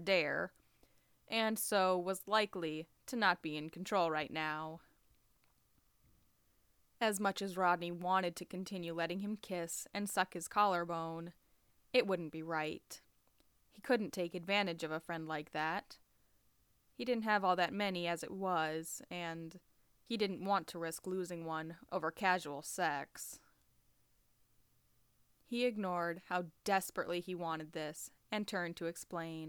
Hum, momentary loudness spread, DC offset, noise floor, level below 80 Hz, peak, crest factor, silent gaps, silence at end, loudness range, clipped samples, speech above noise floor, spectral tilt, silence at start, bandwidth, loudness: none; 11 LU; under 0.1%; -75 dBFS; -78 dBFS; -18 dBFS; 22 dB; none; 0 s; 5 LU; under 0.1%; 37 dB; -4 dB/octave; 0 s; over 20 kHz; -38 LUFS